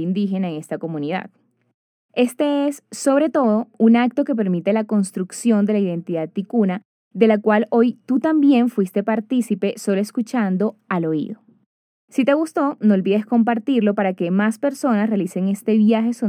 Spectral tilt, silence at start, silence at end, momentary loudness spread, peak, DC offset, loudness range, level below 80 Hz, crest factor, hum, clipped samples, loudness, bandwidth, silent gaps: -6.5 dB/octave; 0 s; 0 s; 9 LU; -2 dBFS; under 0.1%; 4 LU; -84 dBFS; 18 dB; none; under 0.1%; -19 LUFS; 14.5 kHz; 1.74-2.09 s, 6.85-7.11 s, 11.66-12.08 s